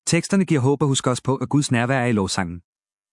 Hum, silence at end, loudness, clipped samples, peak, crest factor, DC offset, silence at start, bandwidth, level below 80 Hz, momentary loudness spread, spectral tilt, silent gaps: none; 0.55 s; -21 LUFS; under 0.1%; -4 dBFS; 16 dB; under 0.1%; 0.05 s; 12 kHz; -58 dBFS; 6 LU; -5 dB/octave; none